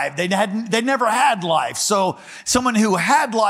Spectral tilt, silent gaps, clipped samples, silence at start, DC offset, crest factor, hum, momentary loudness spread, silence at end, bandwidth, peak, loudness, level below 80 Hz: -3.5 dB/octave; none; under 0.1%; 0 s; under 0.1%; 16 dB; none; 4 LU; 0 s; 16 kHz; -4 dBFS; -18 LUFS; -52 dBFS